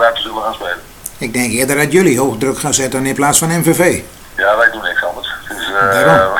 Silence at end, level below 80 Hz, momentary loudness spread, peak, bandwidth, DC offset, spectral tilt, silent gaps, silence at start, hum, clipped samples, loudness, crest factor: 0 s; -42 dBFS; 12 LU; 0 dBFS; 19.5 kHz; under 0.1%; -3.5 dB/octave; none; 0 s; none; under 0.1%; -13 LUFS; 14 dB